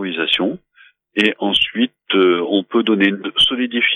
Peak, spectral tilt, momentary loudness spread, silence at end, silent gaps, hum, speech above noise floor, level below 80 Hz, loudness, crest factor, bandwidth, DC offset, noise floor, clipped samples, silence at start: -2 dBFS; -4.5 dB/octave; 6 LU; 0 s; none; none; 34 dB; -54 dBFS; -16 LUFS; 16 dB; 10.5 kHz; under 0.1%; -51 dBFS; under 0.1%; 0 s